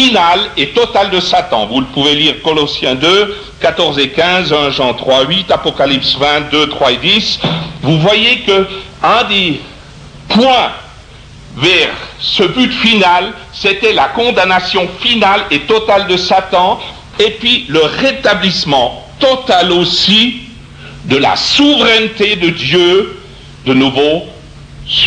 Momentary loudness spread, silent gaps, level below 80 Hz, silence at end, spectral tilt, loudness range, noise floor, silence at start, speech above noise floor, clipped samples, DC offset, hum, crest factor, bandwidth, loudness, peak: 7 LU; none; -38 dBFS; 0 s; -4 dB/octave; 2 LU; -34 dBFS; 0 s; 23 dB; under 0.1%; under 0.1%; none; 12 dB; 10.5 kHz; -10 LUFS; 0 dBFS